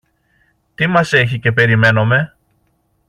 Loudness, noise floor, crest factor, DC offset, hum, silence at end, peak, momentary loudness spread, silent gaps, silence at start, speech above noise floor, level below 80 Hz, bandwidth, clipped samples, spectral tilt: -13 LUFS; -62 dBFS; 14 dB; under 0.1%; none; 0.8 s; -2 dBFS; 6 LU; none; 0.8 s; 49 dB; -50 dBFS; 10.5 kHz; under 0.1%; -6.5 dB/octave